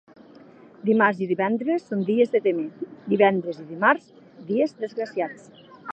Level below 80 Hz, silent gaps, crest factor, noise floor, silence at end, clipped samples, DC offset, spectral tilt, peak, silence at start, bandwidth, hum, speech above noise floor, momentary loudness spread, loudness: -78 dBFS; none; 20 dB; -49 dBFS; 0 s; under 0.1%; under 0.1%; -7.5 dB/octave; -4 dBFS; 0.85 s; 8.2 kHz; none; 26 dB; 13 LU; -23 LUFS